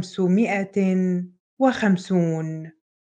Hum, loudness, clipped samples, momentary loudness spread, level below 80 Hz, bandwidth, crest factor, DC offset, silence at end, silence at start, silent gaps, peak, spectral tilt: none; -22 LUFS; under 0.1%; 13 LU; -68 dBFS; 9 kHz; 16 dB; under 0.1%; 0.45 s; 0 s; 1.40-1.57 s; -6 dBFS; -7.5 dB/octave